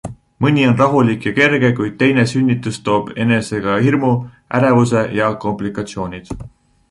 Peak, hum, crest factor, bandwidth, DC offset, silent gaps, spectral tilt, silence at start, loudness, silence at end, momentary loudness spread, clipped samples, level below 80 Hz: 0 dBFS; none; 16 dB; 11.5 kHz; under 0.1%; none; -6.5 dB/octave; 0.05 s; -16 LUFS; 0.45 s; 12 LU; under 0.1%; -46 dBFS